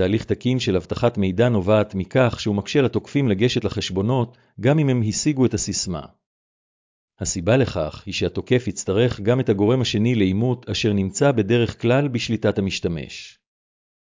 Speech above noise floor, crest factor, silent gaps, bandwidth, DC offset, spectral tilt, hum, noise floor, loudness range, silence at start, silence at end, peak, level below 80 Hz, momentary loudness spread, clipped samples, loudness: over 70 dB; 16 dB; 6.26-7.08 s; 7.6 kHz; under 0.1%; -5.5 dB/octave; none; under -90 dBFS; 3 LU; 0 s; 0.75 s; -6 dBFS; -44 dBFS; 6 LU; under 0.1%; -21 LUFS